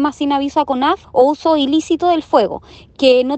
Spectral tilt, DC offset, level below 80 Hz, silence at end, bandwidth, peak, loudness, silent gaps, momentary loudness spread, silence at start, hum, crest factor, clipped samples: -4.5 dB/octave; under 0.1%; -50 dBFS; 0 s; 8.6 kHz; 0 dBFS; -15 LUFS; none; 4 LU; 0 s; none; 14 dB; under 0.1%